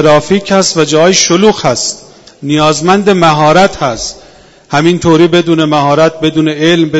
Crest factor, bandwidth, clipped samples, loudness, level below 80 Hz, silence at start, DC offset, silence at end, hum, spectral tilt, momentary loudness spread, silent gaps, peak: 8 dB; 11 kHz; 1%; -8 LUFS; -40 dBFS; 0 s; under 0.1%; 0 s; none; -4.5 dB/octave; 8 LU; none; 0 dBFS